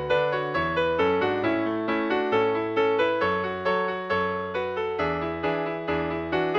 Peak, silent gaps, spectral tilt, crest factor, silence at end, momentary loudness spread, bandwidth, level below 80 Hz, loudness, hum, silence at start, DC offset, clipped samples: -12 dBFS; none; -7 dB/octave; 14 dB; 0 s; 5 LU; 7 kHz; -52 dBFS; -25 LUFS; none; 0 s; under 0.1%; under 0.1%